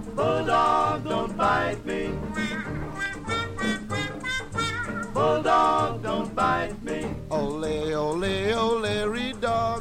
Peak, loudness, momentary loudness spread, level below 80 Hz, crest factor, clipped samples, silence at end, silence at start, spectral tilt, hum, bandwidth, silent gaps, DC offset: -10 dBFS; -26 LUFS; 9 LU; -44 dBFS; 16 dB; under 0.1%; 0 s; 0 s; -5 dB/octave; none; 16 kHz; none; under 0.1%